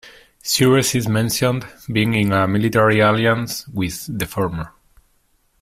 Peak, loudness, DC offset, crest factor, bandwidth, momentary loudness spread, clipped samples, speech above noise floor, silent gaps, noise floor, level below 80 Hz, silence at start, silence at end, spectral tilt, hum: -2 dBFS; -18 LUFS; under 0.1%; 16 dB; 16 kHz; 11 LU; under 0.1%; 44 dB; none; -61 dBFS; -46 dBFS; 0.05 s; 0.95 s; -5 dB/octave; none